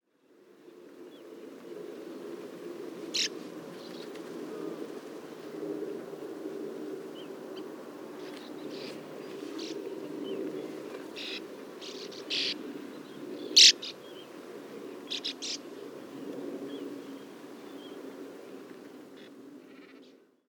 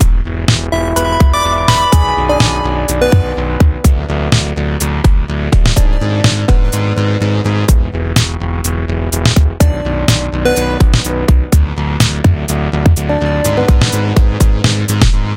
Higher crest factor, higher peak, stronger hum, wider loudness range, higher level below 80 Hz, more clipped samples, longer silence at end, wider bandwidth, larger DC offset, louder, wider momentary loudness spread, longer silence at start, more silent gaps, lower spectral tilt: first, 30 dB vs 12 dB; second, -6 dBFS vs 0 dBFS; neither; first, 18 LU vs 2 LU; second, -90 dBFS vs -14 dBFS; second, under 0.1% vs 0.1%; first, 0.35 s vs 0 s; first, 19.5 kHz vs 17 kHz; neither; second, -30 LUFS vs -13 LUFS; first, 16 LU vs 4 LU; first, 0.3 s vs 0 s; neither; second, -0.5 dB/octave vs -5.5 dB/octave